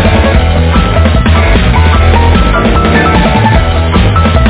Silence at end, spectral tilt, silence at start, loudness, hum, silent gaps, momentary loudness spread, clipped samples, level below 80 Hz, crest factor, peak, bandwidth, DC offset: 0 s; -10.5 dB/octave; 0 s; -8 LUFS; none; none; 2 LU; 3%; -10 dBFS; 6 dB; 0 dBFS; 4 kHz; under 0.1%